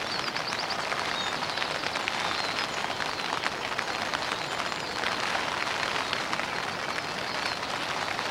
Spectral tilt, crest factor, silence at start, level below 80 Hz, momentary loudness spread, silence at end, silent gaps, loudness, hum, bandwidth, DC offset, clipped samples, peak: -2 dB/octave; 24 dB; 0 s; -62 dBFS; 3 LU; 0 s; none; -29 LUFS; none; 16.5 kHz; under 0.1%; under 0.1%; -8 dBFS